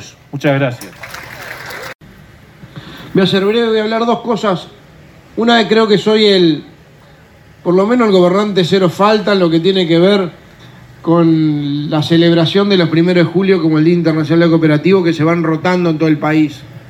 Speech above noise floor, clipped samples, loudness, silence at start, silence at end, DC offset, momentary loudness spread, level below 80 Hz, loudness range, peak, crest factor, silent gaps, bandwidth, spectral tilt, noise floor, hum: 30 dB; under 0.1%; -12 LUFS; 0 s; 0.1 s; under 0.1%; 16 LU; -52 dBFS; 5 LU; 0 dBFS; 12 dB; 1.95-1.99 s; 18 kHz; -7 dB/octave; -42 dBFS; none